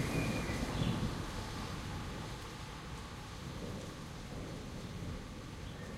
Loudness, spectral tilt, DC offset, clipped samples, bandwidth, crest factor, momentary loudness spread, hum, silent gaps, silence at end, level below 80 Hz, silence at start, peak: -42 LUFS; -5.5 dB/octave; under 0.1%; under 0.1%; 16.5 kHz; 18 dB; 10 LU; none; none; 0 s; -50 dBFS; 0 s; -22 dBFS